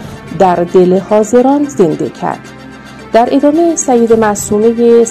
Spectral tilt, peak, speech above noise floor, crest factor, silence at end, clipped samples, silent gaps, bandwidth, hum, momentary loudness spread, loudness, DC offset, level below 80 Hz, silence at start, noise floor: -5.5 dB/octave; 0 dBFS; 21 dB; 10 dB; 0 s; 0.9%; none; 13.5 kHz; none; 16 LU; -10 LUFS; under 0.1%; -44 dBFS; 0 s; -30 dBFS